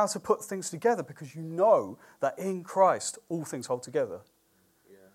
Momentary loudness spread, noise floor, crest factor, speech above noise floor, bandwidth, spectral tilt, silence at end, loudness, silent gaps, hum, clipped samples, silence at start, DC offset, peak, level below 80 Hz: 13 LU; -68 dBFS; 20 dB; 39 dB; 16 kHz; -4.5 dB/octave; 0.2 s; -29 LUFS; none; none; under 0.1%; 0 s; under 0.1%; -10 dBFS; -78 dBFS